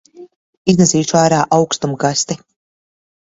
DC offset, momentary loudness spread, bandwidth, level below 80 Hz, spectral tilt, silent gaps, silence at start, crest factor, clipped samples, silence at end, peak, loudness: under 0.1%; 9 LU; 8 kHz; -52 dBFS; -4.5 dB/octave; 0.36-0.65 s; 0.15 s; 16 dB; under 0.1%; 0.85 s; 0 dBFS; -14 LUFS